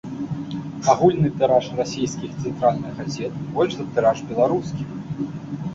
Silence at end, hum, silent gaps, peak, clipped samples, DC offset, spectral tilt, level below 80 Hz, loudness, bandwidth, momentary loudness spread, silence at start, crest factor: 0 s; none; none; -4 dBFS; under 0.1%; under 0.1%; -6.5 dB/octave; -52 dBFS; -22 LUFS; 8 kHz; 12 LU; 0.05 s; 18 dB